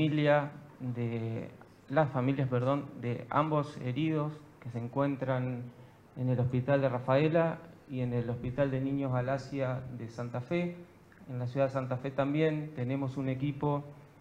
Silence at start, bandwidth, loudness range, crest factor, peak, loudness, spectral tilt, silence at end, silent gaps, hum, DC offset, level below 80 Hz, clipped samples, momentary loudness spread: 0 s; 7.8 kHz; 3 LU; 18 dB; -14 dBFS; -33 LUFS; -8.5 dB/octave; 0.15 s; none; none; under 0.1%; -64 dBFS; under 0.1%; 13 LU